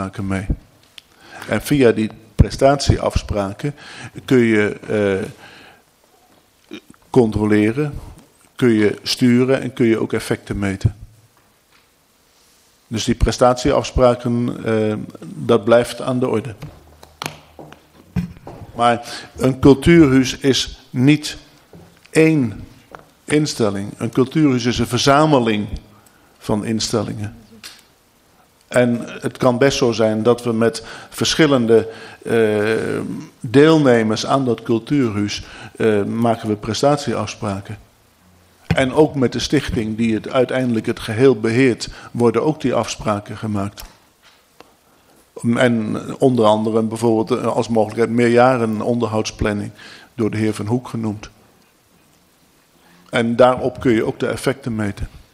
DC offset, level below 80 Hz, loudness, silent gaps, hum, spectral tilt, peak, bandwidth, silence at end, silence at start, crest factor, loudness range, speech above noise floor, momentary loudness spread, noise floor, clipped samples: under 0.1%; -36 dBFS; -17 LUFS; none; none; -6 dB/octave; 0 dBFS; 15.5 kHz; 0.15 s; 0 s; 18 dB; 7 LU; 40 dB; 16 LU; -56 dBFS; under 0.1%